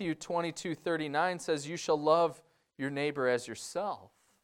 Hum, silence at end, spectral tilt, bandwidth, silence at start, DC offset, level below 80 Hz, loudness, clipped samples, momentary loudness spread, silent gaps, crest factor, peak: none; 0.35 s; -4.5 dB/octave; 15 kHz; 0 s; under 0.1%; -74 dBFS; -33 LUFS; under 0.1%; 10 LU; none; 20 dB; -12 dBFS